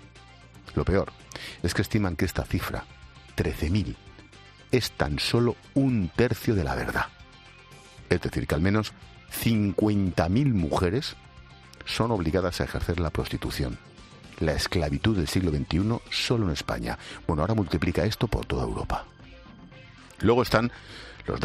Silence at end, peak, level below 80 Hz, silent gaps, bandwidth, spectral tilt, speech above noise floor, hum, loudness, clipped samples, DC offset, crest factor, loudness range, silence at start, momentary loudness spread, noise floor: 0 s; -6 dBFS; -42 dBFS; none; 14 kHz; -6 dB/octave; 24 dB; none; -27 LUFS; under 0.1%; under 0.1%; 22 dB; 3 LU; 0 s; 13 LU; -50 dBFS